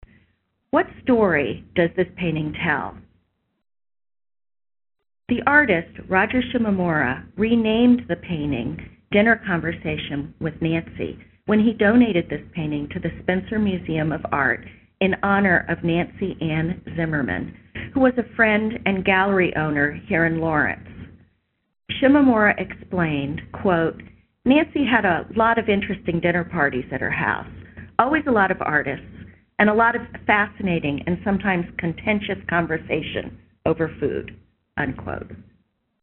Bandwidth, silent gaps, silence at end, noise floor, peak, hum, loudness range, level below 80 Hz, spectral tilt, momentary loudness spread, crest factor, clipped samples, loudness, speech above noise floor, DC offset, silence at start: 4.2 kHz; none; 0.6 s; -68 dBFS; 0 dBFS; none; 4 LU; -48 dBFS; -4.5 dB/octave; 12 LU; 22 dB; under 0.1%; -21 LUFS; 47 dB; under 0.1%; 0.75 s